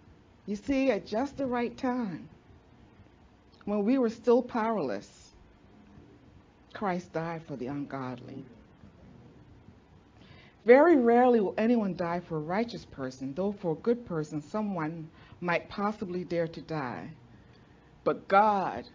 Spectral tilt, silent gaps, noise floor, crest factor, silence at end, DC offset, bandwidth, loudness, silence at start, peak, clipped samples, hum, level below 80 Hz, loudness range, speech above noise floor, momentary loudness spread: -7.5 dB/octave; none; -58 dBFS; 24 dB; 0.05 s; under 0.1%; 7.6 kHz; -29 LUFS; 0.45 s; -6 dBFS; under 0.1%; none; -62 dBFS; 13 LU; 30 dB; 17 LU